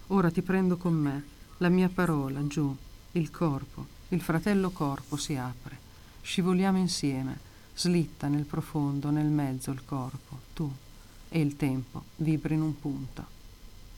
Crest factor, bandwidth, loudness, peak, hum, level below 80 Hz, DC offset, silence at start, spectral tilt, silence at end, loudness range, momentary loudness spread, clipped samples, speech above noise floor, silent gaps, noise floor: 18 dB; 17 kHz; -30 LUFS; -12 dBFS; none; -50 dBFS; under 0.1%; 0 s; -6.5 dB/octave; 0 s; 4 LU; 17 LU; under 0.1%; 19 dB; none; -48 dBFS